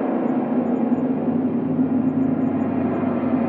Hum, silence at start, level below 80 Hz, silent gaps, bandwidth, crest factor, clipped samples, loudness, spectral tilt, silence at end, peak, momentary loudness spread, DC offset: none; 0 s; -68 dBFS; none; 3.5 kHz; 12 dB; under 0.1%; -21 LUFS; -11.5 dB/octave; 0 s; -8 dBFS; 2 LU; under 0.1%